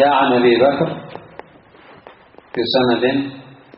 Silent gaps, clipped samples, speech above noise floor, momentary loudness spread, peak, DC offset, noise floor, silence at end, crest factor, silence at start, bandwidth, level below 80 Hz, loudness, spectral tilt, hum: none; under 0.1%; 30 dB; 18 LU; -2 dBFS; under 0.1%; -45 dBFS; 0.35 s; 16 dB; 0 s; 5.6 kHz; -56 dBFS; -16 LUFS; -3.5 dB/octave; none